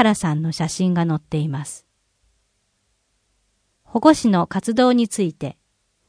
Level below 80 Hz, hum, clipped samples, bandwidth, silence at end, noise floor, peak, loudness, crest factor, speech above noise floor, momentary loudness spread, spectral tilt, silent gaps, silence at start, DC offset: -54 dBFS; none; under 0.1%; 10.5 kHz; 0.55 s; -68 dBFS; 0 dBFS; -19 LUFS; 20 dB; 50 dB; 15 LU; -6 dB/octave; none; 0 s; under 0.1%